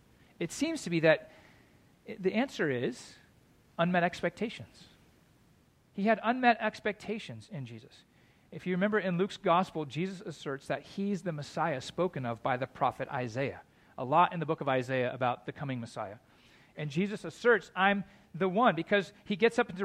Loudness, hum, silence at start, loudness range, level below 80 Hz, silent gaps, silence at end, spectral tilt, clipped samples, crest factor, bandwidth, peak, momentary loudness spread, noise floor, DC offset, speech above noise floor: -32 LUFS; none; 0.4 s; 4 LU; -70 dBFS; none; 0 s; -6 dB/octave; under 0.1%; 22 dB; 14 kHz; -12 dBFS; 16 LU; -65 dBFS; under 0.1%; 34 dB